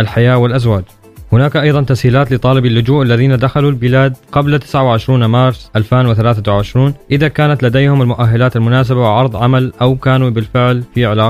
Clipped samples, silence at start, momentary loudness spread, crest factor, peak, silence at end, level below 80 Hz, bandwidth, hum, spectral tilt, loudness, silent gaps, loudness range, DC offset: under 0.1%; 0 s; 3 LU; 10 dB; 0 dBFS; 0 s; -36 dBFS; 10 kHz; none; -8 dB/octave; -11 LUFS; none; 1 LU; 0.2%